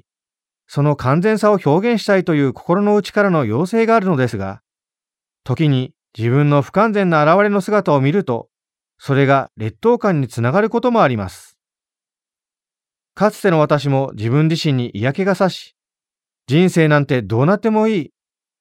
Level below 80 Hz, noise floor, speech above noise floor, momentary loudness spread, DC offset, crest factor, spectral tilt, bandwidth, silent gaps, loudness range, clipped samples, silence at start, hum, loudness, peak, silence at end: -56 dBFS; under -90 dBFS; over 75 dB; 9 LU; under 0.1%; 16 dB; -7.5 dB/octave; 14.5 kHz; none; 4 LU; under 0.1%; 0.7 s; none; -16 LUFS; -2 dBFS; 0.55 s